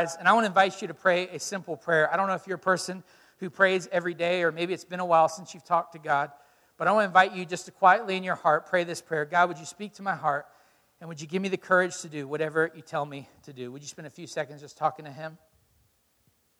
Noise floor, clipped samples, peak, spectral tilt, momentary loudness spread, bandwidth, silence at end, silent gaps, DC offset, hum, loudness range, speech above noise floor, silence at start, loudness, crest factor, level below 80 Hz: -69 dBFS; under 0.1%; -6 dBFS; -4 dB/octave; 18 LU; 15.5 kHz; 1.25 s; none; under 0.1%; none; 8 LU; 42 dB; 0 s; -26 LUFS; 22 dB; -76 dBFS